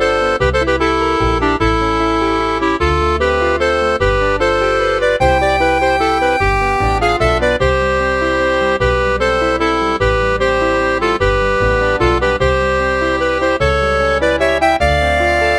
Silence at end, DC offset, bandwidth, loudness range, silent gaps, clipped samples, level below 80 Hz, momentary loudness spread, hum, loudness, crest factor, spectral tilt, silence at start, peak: 0 s; under 0.1%; 12.5 kHz; 1 LU; none; under 0.1%; -24 dBFS; 2 LU; none; -14 LUFS; 14 dB; -5.5 dB/octave; 0 s; 0 dBFS